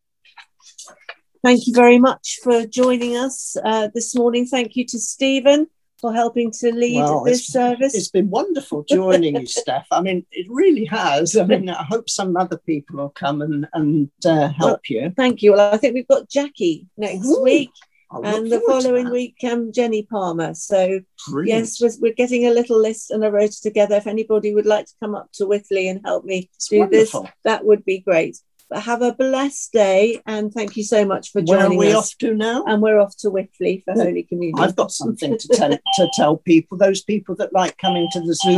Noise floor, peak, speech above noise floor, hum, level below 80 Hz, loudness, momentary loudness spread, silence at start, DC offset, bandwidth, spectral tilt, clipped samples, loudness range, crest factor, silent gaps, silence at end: -48 dBFS; 0 dBFS; 31 dB; none; -64 dBFS; -18 LUFS; 9 LU; 0.4 s; under 0.1%; 12.5 kHz; -4.5 dB/octave; under 0.1%; 3 LU; 18 dB; none; 0 s